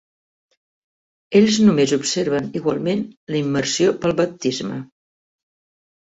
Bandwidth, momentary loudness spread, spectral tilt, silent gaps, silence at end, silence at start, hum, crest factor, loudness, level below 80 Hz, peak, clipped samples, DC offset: 8 kHz; 11 LU; -5 dB/octave; 3.17-3.27 s; 1.25 s; 1.3 s; none; 20 dB; -19 LUFS; -60 dBFS; -2 dBFS; under 0.1%; under 0.1%